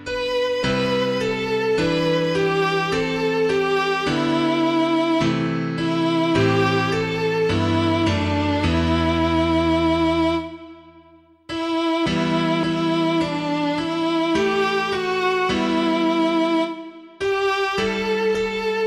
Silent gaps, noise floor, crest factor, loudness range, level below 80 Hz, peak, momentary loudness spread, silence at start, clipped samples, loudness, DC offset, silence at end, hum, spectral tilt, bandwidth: none; -51 dBFS; 14 dB; 2 LU; -42 dBFS; -6 dBFS; 4 LU; 0 s; under 0.1%; -20 LUFS; under 0.1%; 0 s; none; -6 dB/octave; 11.5 kHz